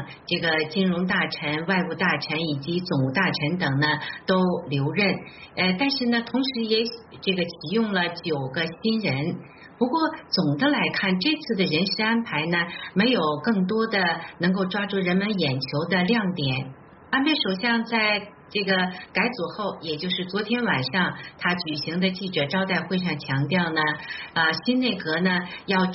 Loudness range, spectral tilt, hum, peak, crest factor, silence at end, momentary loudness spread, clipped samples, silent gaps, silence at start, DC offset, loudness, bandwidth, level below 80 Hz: 2 LU; -3.5 dB/octave; none; -6 dBFS; 18 dB; 0 s; 6 LU; under 0.1%; none; 0 s; under 0.1%; -24 LUFS; 6 kHz; -62 dBFS